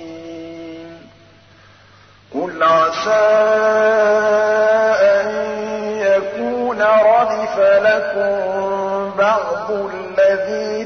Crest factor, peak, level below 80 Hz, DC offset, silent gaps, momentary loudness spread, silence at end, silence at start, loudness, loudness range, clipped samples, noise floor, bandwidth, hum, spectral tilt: 12 dB; -4 dBFS; -60 dBFS; 0.1%; none; 12 LU; 0 s; 0 s; -15 LUFS; 4 LU; under 0.1%; -47 dBFS; 6.6 kHz; none; -4.5 dB/octave